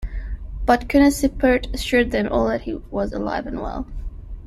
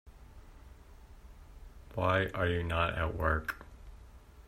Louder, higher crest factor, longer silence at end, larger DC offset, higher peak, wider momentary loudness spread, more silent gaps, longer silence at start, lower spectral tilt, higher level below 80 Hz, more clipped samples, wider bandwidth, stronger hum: first, -21 LUFS vs -33 LUFS; about the same, 18 dB vs 22 dB; about the same, 0 s vs 0.05 s; neither; first, -2 dBFS vs -14 dBFS; second, 17 LU vs 25 LU; neither; about the same, 0 s vs 0.05 s; about the same, -5.5 dB/octave vs -6.5 dB/octave; first, -32 dBFS vs -48 dBFS; neither; second, 14 kHz vs 15.5 kHz; neither